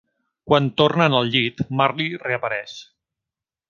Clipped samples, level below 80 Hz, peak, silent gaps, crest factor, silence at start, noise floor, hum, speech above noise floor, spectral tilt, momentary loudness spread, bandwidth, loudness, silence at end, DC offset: under 0.1%; -58 dBFS; 0 dBFS; none; 22 dB; 0.45 s; -88 dBFS; none; 68 dB; -6.5 dB/octave; 11 LU; 7.2 kHz; -20 LUFS; 0.85 s; under 0.1%